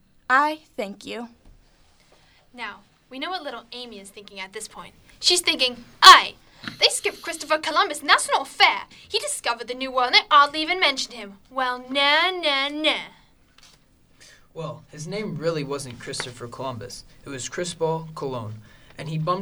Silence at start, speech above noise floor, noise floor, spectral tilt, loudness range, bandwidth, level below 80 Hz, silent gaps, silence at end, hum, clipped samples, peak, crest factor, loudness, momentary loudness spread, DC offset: 0.3 s; 34 dB; -57 dBFS; -2 dB/octave; 18 LU; over 20 kHz; -58 dBFS; none; 0 s; none; under 0.1%; 0 dBFS; 24 dB; -20 LUFS; 20 LU; under 0.1%